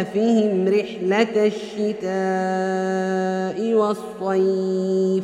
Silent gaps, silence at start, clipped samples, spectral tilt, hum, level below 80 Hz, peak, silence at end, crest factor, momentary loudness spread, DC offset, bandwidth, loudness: none; 0 s; under 0.1%; -6.5 dB/octave; none; -68 dBFS; -4 dBFS; 0 s; 16 dB; 5 LU; under 0.1%; 11 kHz; -21 LUFS